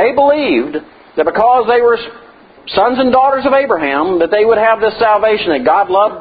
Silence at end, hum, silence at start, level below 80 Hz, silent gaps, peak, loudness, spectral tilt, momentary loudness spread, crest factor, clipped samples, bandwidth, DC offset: 0 s; none; 0 s; -48 dBFS; none; 0 dBFS; -12 LUFS; -8 dB/octave; 7 LU; 12 dB; under 0.1%; 5 kHz; under 0.1%